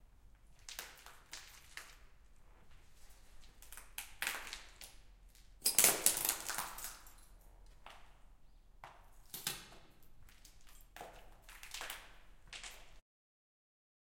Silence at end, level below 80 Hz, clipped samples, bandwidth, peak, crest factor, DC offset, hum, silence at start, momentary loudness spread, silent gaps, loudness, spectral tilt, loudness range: 1 s; -62 dBFS; under 0.1%; 17 kHz; -8 dBFS; 36 dB; under 0.1%; none; 0 s; 27 LU; none; -37 LUFS; 0.5 dB/octave; 19 LU